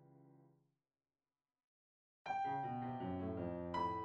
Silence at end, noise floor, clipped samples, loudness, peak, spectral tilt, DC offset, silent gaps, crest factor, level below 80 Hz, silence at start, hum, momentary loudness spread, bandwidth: 0 s; under -90 dBFS; under 0.1%; -43 LUFS; -30 dBFS; -8 dB/octave; under 0.1%; 1.64-2.25 s; 16 dB; -72 dBFS; 0 s; none; 4 LU; 7.8 kHz